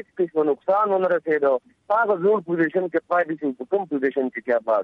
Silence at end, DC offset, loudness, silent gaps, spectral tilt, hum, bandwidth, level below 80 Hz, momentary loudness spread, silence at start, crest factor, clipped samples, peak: 0 s; under 0.1%; -22 LUFS; none; -9 dB/octave; none; 5 kHz; -74 dBFS; 6 LU; 0.15 s; 12 dB; under 0.1%; -10 dBFS